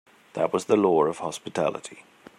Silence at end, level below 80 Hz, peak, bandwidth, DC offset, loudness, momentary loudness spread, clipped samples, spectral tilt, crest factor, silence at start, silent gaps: 0.4 s; -72 dBFS; -6 dBFS; 13.5 kHz; under 0.1%; -25 LUFS; 18 LU; under 0.1%; -5.5 dB/octave; 18 dB; 0.35 s; none